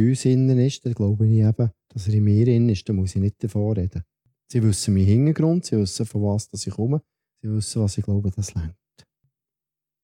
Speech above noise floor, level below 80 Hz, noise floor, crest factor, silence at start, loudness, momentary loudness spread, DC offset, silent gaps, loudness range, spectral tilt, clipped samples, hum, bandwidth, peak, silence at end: 68 dB; -48 dBFS; -88 dBFS; 14 dB; 0 s; -22 LUFS; 10 LU; under 0.1%; none; 6 LU; -7 dB/octave; under 0.1%; none; 11.5 kHz; -8 dBFS; 1.3 s